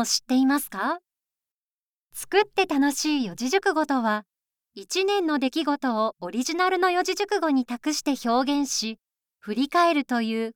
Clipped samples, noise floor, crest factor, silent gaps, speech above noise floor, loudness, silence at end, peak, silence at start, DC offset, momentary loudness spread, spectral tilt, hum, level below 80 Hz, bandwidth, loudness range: under 0.1%; under -90 dBFS; 18 dB; 1.51-2.10 s; over 66 dB; -24 LUFS; 0.05 s; -6 dBFS; 0 s; under 0.1%; 8 LU; -2.5 dB/octave; none; -66 dBFS; 19.5 kHz; 1 LU